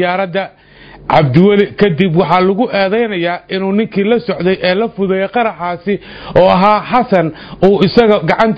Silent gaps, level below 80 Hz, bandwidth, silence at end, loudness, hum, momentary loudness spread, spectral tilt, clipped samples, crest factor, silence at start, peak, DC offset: none; -44 dBFS; 7 kHz; 0 s; -12 LUFS; none; 9 LU; -8.5 dB/octave; 0.3%; 12 dB; 0 s; 0 dBFS; under 0.1%